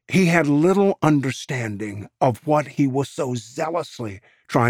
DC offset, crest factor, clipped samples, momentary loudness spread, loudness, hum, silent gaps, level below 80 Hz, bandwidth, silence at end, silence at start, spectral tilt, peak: under 0.1%; 18 dB; under 0.1%; 14 LU; -21 LUFS; none; none; -60 dBFS; 15.5 kHz; 0 s; 0.1 s; -6.5 dB/octave; -4 dBFS